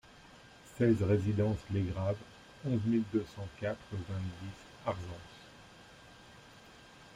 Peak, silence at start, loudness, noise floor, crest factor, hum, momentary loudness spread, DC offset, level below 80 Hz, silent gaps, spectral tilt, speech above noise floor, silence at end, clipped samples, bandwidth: -18 dBFS; 0.25 s; -35 LUFS; -57 dBFS; 18 dB; none; 24 LU; under 0.1%; -60 dBFS; none; -8 dB/octave; 23 dB; 0 s; under 0.1%; 11 kHz